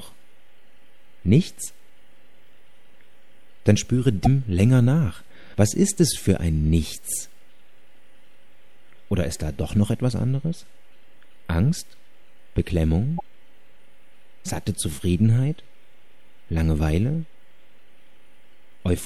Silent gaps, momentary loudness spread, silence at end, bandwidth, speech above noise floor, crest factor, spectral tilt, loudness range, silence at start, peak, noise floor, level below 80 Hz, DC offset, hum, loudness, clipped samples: none; 13 LU; 0 s; 14 kHz; 39 dB; 20 dB; -6 dB/octave; 8 LU; 0 s; -4 dBFS; -60 dBFS; -38 dBFS; 2%; none; -23 LUFS; under 0.1%